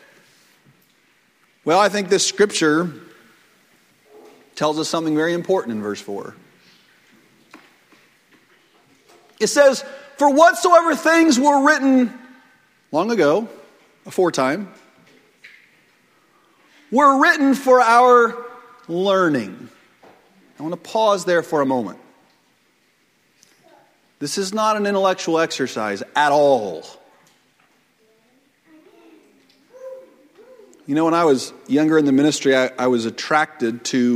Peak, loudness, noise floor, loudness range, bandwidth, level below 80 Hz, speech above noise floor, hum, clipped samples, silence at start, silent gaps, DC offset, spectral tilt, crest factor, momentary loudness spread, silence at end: 0 dBFS; -17 LUFS; -61 dBFS; 10 LU; 16 kHz; -70 dBFS; 44 dB; none; under 0.1%; 1.65 s; none; under 0.1%; -4 dB/octave; 20 dB; 17 LU; 0 s